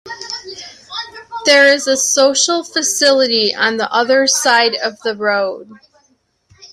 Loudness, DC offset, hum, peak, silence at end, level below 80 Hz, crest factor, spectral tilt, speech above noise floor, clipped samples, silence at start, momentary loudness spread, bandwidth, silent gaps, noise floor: -13 LUFS; under 0.1%; none; 0 dBFS; 0.05 s; -64 dBFS; 16 dB; -0.5 dB/octave; 46 dB; under 0.1%; 0.05 s; 16 LU; 16 kHz; none; -60 dBFS